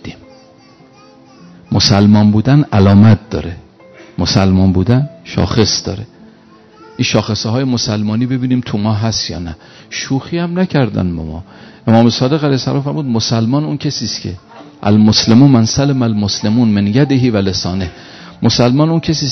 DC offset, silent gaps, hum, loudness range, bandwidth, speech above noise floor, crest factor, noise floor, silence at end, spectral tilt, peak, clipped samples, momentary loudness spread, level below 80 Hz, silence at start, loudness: under 0.1%; none; none; 5 LU; 6.4 kHz; 31 dB; 12 dB; -43 dBFS; 0 s; -6 dB/octave; 0 dBFS; 0.3%; 16 LU; -40 dBFS; 0.05 s; -13 LUFS